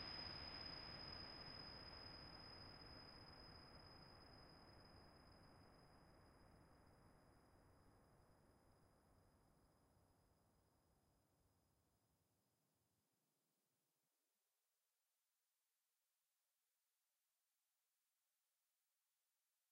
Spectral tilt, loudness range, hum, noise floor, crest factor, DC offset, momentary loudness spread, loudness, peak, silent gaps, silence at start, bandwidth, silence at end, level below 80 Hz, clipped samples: -4.5 dB/octave; 13 LU; none; under -90 dBFS; 22 dB; under 0.1%; 15 LU; -57 LUFS; -42 dBFS; none; 0 s; 15 kHz; 7.35 s; -76 dBFS; under 0.1%